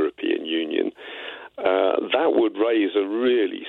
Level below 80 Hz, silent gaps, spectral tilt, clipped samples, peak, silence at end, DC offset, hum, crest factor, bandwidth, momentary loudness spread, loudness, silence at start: -70 dBFS; none; -6.5 dB/octave; under 0.1%; -8 dBFS; 0 s; under 0.1%; none; 16 dB; 4.2 kHz; 13 LU; -22 LUFS; 0 s